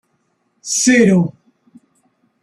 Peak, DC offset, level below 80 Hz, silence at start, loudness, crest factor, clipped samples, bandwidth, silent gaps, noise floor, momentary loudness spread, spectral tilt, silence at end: -2 dBFS; under 0.1%; -58 dBFS; 0.65 s; -14 LUFS; 16 dB; under 0.1%; 13 kHz; none; -65 dBFS; 14 LU; -4.5 dB/octave; 1.15 s